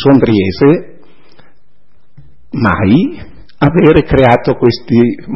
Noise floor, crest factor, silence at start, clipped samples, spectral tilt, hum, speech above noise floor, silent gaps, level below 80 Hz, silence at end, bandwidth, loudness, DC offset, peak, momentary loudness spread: -56 dBFS; 12 dB; 0 s; 0.3%; -9.5 dB/octave; none; 47 dB; none; -32 dBFS; 0 s; 5.8 kHz; -10 LUFS; 3%; 0 dBFS; 7 LU